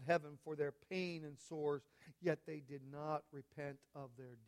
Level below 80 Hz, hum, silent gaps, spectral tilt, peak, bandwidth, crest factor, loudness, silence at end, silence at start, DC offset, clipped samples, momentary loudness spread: -84 dBFS; none; none; -6.5 dB/octave; -24 dBFS; 14.5 kHz; 20 dB; -45 LUFS; 0 s; 0 s; under 0.1%; under 0.1%; 13 LU